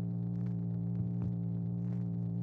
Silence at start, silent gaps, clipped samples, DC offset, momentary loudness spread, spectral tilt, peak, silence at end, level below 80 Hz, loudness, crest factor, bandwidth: 0 s; none; under 0.1%; under 0.1%; 1 LU; -12.5 dB/octave; -24 dBFS; 0 s; -58 dBFS; -36 LUFS; 10 dB; 2.1 kHz